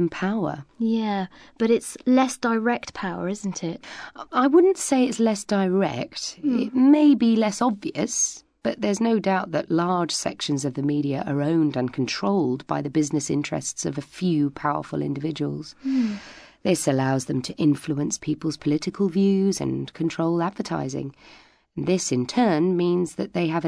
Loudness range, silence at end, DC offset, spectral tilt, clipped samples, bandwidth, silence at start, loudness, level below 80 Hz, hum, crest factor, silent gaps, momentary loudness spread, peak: 5 LU; 0 s; under 0.1%; -5 dB/octave; under 0.1%; 11 kHz; 0 s; -23 LUFS; -60 dBFS; none; 16 dB; none; 9 LU; -6 dBFS